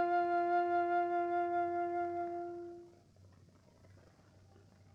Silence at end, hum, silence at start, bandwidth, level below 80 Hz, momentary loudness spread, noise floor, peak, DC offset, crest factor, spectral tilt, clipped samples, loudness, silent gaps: 1 s; none; 0 s; 6.6 kHz; -78 dBFS; 14 LU; -63 dBFS; -24 dBFS; under 0.1%; 14 dB; -7.5 dB/octave; under 0.1%; -35 LUFS; none